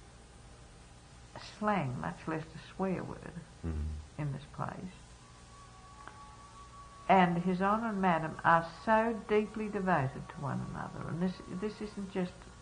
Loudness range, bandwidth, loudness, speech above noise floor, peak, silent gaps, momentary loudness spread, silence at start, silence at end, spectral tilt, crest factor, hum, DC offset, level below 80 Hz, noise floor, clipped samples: 13 LU; 10 kHz; -34 LUFS; 22 dB; -12 dBFS; none; 24 LU; 0 s; 0 s; -7 dB/octave; 22 dB; none; under 0.1%; -54 dBFS; -55 dBFS; under 0.1%